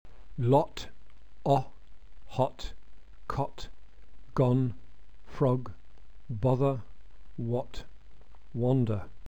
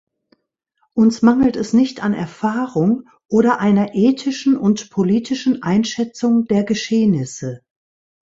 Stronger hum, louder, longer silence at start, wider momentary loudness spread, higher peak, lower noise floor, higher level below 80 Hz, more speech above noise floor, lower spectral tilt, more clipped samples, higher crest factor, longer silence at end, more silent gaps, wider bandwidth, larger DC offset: neither; second, -30 LUFS vs -17 LUFS; second, 0.2 s vs 0.95 s; first, 21 LU vs 8 LU; second, -12 dBFS vs 0 dBFS; second, -54 dBFS vs -68 dBFS; about the same, -50 dBFS vs -54 dBFS; second, 25 dB vs 51 dB; first, -8.5 dB/octave vs -6 dB/octave; neither; about the same, 20 dB vs 16 dB; second, 0 s vs 0.7 s; neither; about the same, 8.2 kHz vs 8 kHz; first, 1% vs under 0.1%